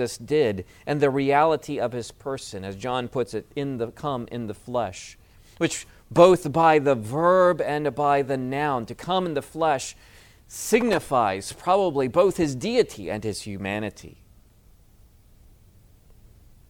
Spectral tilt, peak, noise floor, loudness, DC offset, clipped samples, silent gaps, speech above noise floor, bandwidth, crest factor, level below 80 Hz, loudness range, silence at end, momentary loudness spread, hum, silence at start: -5.5 dB/octave; -2 dBFS; -54 dBFS; -24 LUFS; under 0.1%; under 0.1%; none; 31 dB; 17.5 kHz; 22 dB; -54 dBFS; 10 LU; 2.6 s; 14 LU; none; 0 s